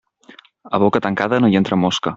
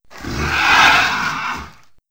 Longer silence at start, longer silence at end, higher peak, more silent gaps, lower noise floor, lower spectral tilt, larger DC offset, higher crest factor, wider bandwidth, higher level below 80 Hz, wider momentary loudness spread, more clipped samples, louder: first, 0.65 s vs 0.15 s; second, 0 s vs 0.4 s; about the same, 0 dBFS vs -2 dBFS; neither; first, -47 dBFS vs -39 dBFS; first, -6 dB/octave vs -2 dB/octave; second, under 0.1% vs 0.6%; about the same, 18 dB vs 16 dB; second, 7.8 kHz vs 16.5 kHz; second, -54 dBFS vs -36 dBFS; second, 4 LU vs 17 LU; neither; second, -17 LUFS vs -14 LUFS